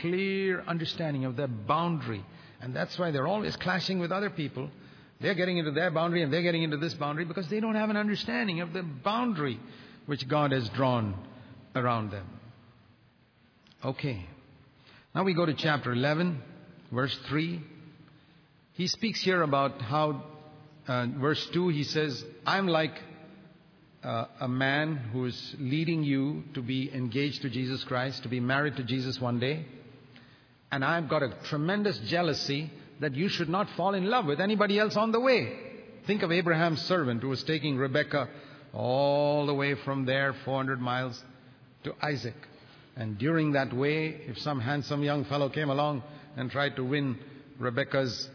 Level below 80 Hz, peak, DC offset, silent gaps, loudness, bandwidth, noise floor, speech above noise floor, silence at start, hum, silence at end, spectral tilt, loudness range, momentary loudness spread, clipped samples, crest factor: -68 dBFS; -10 dBFS; under 0.1%; none; -30 LUFS; 5.4 kHz; -63 dBFS; 34 dB; 0 s; none; 0 s; -6.5 dB/octave; 5 LU; 12 LU; under 0.1%; 20 dB